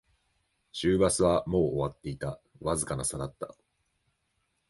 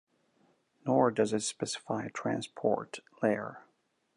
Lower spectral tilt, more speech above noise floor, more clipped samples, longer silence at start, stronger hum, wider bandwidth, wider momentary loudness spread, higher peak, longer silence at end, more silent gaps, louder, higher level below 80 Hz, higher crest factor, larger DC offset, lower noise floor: about the same, -5 dB/octave vs -4.5 dB/octave; first, 48 dB vs 39 dB; neither; about the same, 0.75 s vs 0.85 s; neither; about the same, 12 kHz vs 11 kHz; first, 14 LU vs 10 LU; about the same, -12 dBFS vs -12 dBFS; first, 1.2 s vs 0.55 s; neither; first, -29 LUFS vs -32 LUFS; first, -50 dBFS vs -78 dBFS; about the same, 18 dB vs 20 dB; neither; first, -77 dBFS vs -70 dBFS